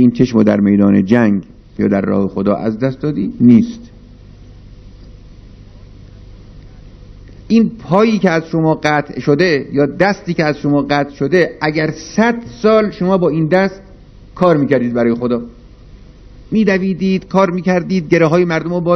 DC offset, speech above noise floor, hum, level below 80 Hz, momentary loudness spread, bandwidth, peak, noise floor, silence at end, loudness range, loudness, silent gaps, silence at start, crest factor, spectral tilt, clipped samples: under 0.1%; 25 dB; none; -42 dBFS; 7 LU; 6.4 kHz; 0 dBFS; -38 dBFS; 0 s; 4 LU; -14 LUFS; none; 0 s; 14 dB; -7.5 dB/octave; 0.1%